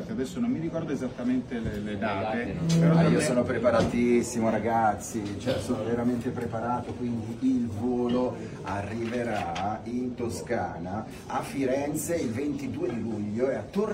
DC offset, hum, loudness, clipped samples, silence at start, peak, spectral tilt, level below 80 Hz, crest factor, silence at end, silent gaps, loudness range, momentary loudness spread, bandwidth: under 0.1%; none; -28 LUFS; under 0.1%; 0 s; -10 dBFS; -6.5 dB/octave; -52 dBFS; 18 dB; 0 s; none; 6 LU; 9 LU; 16 kHz